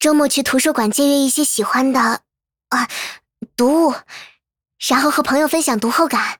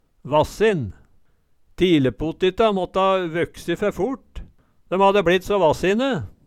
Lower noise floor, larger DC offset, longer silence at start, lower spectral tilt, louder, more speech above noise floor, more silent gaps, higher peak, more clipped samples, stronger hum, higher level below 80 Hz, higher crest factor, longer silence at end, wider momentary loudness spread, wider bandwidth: second, -49 dBFS vs -57 dBFS; neither; second, 0 s vs 0.25 s; second, -2.5 dB/octave vs -6 dB/octave; first, -16 LUFS vs -20 LUFS; second, 33 dB vs 38 dB; neither; about the same, -2 dBFS vs -4 dBFS; neither; neither; second, -58 dBFS vs -44 dBFS; about the same, 14 dB vs 16 dB; about the same, 0.05 s vs 0.15 s; first, 13 LU vs 9 LU; first, over 20 kHz vs 14.5 kHz